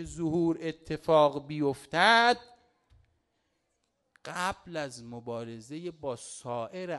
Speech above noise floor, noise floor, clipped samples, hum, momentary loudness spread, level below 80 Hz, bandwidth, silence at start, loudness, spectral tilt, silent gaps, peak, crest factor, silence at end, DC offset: 48 dB; -78 dBFS; under 0.1%; none; 18 LU; -62 dBFS; 12 kHz; 0 s; -29 LUFS; -4.5 dB/octave; none; -10 dBFS; 22 dB; 0 s; under 0.1%